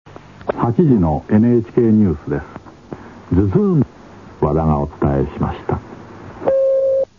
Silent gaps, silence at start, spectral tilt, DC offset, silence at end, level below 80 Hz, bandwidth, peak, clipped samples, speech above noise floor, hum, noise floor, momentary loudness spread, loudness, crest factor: none; 0.05 s; -11 dB/octave; 0.2%; 0.15 s; -34 dBFS; 6.8 kHz; -2 dBFS; under 0.1%; 20 dB; none; -35 dBFS; 21 LU; -17 LUFS; 16 dB